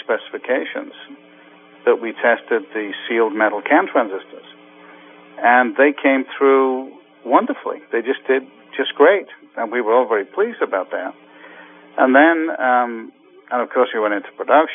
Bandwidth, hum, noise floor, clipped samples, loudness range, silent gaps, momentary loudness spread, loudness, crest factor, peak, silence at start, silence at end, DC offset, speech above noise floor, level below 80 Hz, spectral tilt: 3.7 kHz; none; -46 dBFS; under 0.1%; 3 LU; none; 13 LU; -18 LUFS; 18 dB; 0 dBFS; 0.1 s; 0 s; under 0.1%; 28 dB; under -90 dBFS; -8 dB/octave